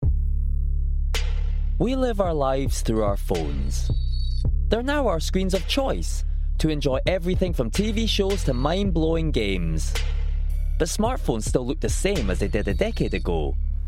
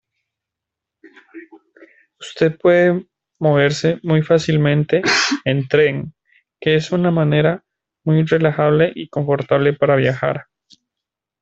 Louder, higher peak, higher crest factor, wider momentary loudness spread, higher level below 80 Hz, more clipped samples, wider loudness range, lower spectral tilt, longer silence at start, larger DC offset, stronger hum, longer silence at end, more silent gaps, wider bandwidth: second, -25 LUFS vs -16 LUFS; second, -6 dBFS vs 0 dBFS; about the same, 16 dB vs 18 dB; second, 5 LU vs 9 LU; first, -24 dBFS vs -56 dBFS; neither; about the same, 2 LU vs 3 LU; about the same, -5.5 dB/octave vs -6 dB/octave; second, 0 s vs 1.35 s; neither; neither; second, 0 s vs 1 s; neither; first, 14.5 kHz vs 8 kHz